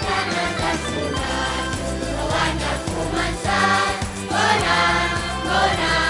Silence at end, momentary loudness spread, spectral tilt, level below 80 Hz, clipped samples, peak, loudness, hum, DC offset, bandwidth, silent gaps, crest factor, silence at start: 0 s; 7 LU; -3.5 dB/octave; -34 dBFS; under 0.1%; -4 dBFS; -21 LUFS; none; under 0.1%; 11.5 kHz; none; 18 dB; 0 s